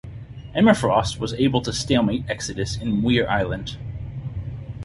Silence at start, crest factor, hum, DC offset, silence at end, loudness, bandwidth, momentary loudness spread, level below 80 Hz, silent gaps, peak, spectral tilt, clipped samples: 0.05 s; 20 dB; none; under 0.1%; 0 s; -22 LUFS; 11.5 kHz; 15 LU; -40 dBFS; none; -2 dBFS; -5.5 dB/octave; under 0.1%